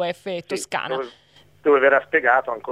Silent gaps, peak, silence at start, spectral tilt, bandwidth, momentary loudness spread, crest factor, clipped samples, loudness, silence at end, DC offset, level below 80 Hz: none; -4 dBFS; 0 s; -3.5 dB/octave; 13.5 kHz; 13 LU; 18 dB; under 0.1%; -20 LUFS; 0 s; under 0.1%; -68 dBFS